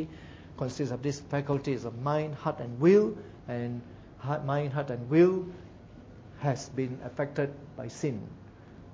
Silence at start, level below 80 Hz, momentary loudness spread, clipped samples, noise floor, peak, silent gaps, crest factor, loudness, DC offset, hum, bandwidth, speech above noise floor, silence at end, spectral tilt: 0 s; -58 dBFS; 25 LU; under 0.1%; -50 dBFS; -10 dBFS; none; 20 dB; -30 LUFS; under 0.1%; none; 8 kHz; 20 dB; 0 s; -7.5 dB/octave